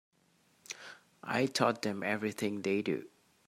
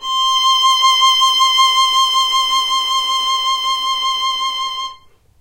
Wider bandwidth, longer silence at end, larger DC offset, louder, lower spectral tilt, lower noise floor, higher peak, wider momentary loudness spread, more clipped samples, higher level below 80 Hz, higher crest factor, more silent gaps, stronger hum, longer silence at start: about the same, 16 kHz vs 16 kHz; about the same, 0.4 s vs 0.45 s; neither; second, -33 LUFS vs -13 LUFS; first, -4.5 dB/octave vs 3.5 dB/octave; first, -70 dBFS vs -42 dBFS; second, -12 dBFS vs -2 dBFS; first, 16 LU vs 8 LU; neither; second, -80 dBFS vs -56 dBFS; first, 24 dB vs 14 dB; neither; neither; first, 0.7 s vs 0 s